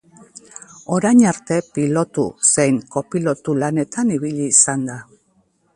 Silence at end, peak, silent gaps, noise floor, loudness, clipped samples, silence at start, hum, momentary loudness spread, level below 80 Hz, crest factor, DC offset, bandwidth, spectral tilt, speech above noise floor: 0.75 s; 0 dBFS; none; -61 dBFS; -17 LUFS; under 0.1%; 0.35 s; none; 18 LU; -58 dBFS; 18 dB; under 0.1%; 11.5 kHz; -4.5 dB/octave; 43 dB